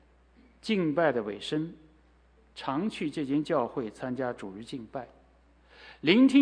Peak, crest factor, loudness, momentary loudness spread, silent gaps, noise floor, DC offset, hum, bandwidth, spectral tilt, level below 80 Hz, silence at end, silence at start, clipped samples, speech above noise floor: -8 dBFS; 22 dB; -30 LUFS; 16 LU; none; -61 dBFS; under 0.1%; none; 10 kHz; -6 dB/octave; -64 dBFS; 0 s; 0.65 s; under 0.1%; 34 dB